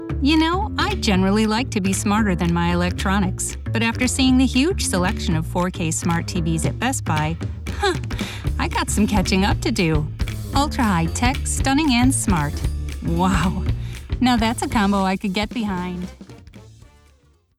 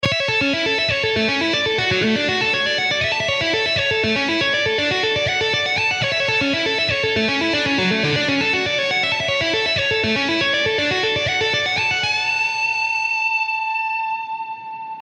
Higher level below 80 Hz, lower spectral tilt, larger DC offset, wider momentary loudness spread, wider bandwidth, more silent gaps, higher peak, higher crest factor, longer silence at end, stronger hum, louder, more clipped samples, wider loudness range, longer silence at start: first, -30 dBFS vs -50 dBFS; first, -5 dB/octave vs -3.5 dB/octave; neither; first, 8 LU vs 1 LU; first, 16.5 kHz vs 10.5 kHz; neither; about the same, -6 dBFS vs -6 dBFS; about the same, 16 dB vs 14 dB; first, 0.9 s vs 0 s; neither; about the same, -20 LUFS vs -18 LUFS; neither; first, 3 LU vs 0 LU; about the same, 0 s vs 0 s